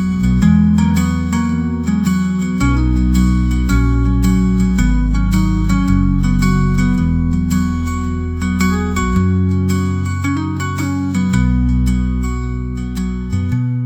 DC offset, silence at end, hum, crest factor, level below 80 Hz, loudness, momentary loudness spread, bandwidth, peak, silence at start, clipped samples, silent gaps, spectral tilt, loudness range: 0.2%; 0 s; none; 12 dB; -20 dBFS; -16 LUFS; 6 LU; 16 kHz; -2 dBFS; 0 s; under 0.1%; none; -7 dB/octave; 3 LU